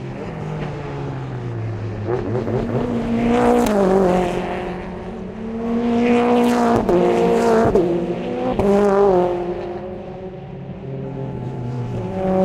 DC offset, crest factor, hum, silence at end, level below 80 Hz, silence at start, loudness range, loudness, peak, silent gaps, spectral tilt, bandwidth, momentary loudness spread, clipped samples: under 0.1%; 18 dB; none; 0 s; -40 dBFS; 0 s; 6 LU; -19 LUFS; 0 dBFS; none; -7.5 dB/octave; 16 kHz; 14 LU; under 0.1%